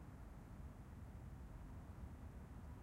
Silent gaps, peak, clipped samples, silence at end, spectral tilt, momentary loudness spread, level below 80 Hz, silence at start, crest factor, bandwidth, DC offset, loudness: none; -42 dBFS; under 0.1%; 0 s; -7.5 dB/octave; 2 LU; -58 dBFS; 0 s; 12 dB; 16 kHz; under 0.1%; -57 LUFS